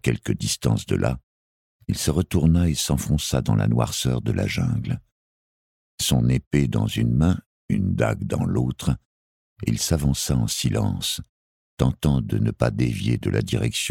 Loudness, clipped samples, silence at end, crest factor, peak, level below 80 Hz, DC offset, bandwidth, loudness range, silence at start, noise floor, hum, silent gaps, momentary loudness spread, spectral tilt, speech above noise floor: -23 LUFS; under 0.1%; 0 s; 18 dB; -4 dBFS; -36 dBFS; under 0.1%; 17 kHz; 2 LU; 0.05 s; under -90 dBFS; none; 1.23-1.79 s, 5.12-5.98 s, 6.47-6.51 s, 7.46-7.68 s, 9.05-9.56 s, 11.29-11.77 s; 7 LU; -5.5 dB/octave; over 68 dB